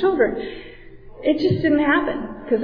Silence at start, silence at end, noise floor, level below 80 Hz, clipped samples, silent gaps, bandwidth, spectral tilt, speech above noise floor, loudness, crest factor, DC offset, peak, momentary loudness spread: 0 s; 0 s; -40 dBFS; -44 dBFS; under 0.1%; none; 5.2 kHz; -8.5 dB/octave; 20 dB; -20 LUFS; 14 dB; under 0.1%; -6 dBFS; 13 LU